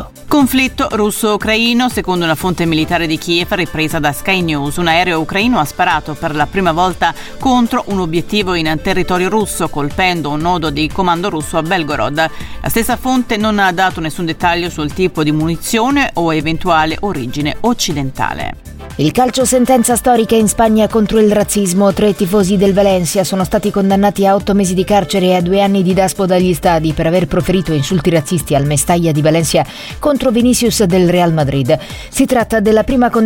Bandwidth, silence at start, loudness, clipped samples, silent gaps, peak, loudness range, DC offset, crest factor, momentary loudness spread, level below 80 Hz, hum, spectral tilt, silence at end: 17 kHz; 0 s; -13 LUFS; under 0.1%; none; 0 dBFS; 3 LU; under 0.1%; 12 dB; 6 LU; -32 dBFS; none; -5 dB/octave; 0 s